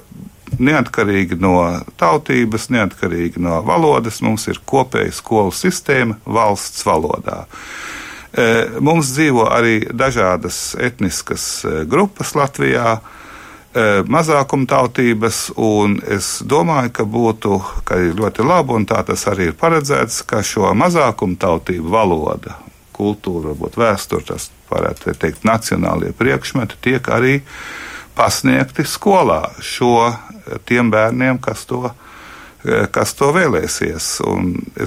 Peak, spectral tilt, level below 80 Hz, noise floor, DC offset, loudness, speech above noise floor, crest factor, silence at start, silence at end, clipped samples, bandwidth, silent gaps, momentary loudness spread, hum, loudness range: -2 dBFS; -5 dB/octave; -40 dBFS; -37 dBFS; under 0.1%; -16 LUFS; 22 dB; 14 dB; 0.15 s; 0 s; under 0.1%; 16 kHz; none; 10 LU; none; 3 LU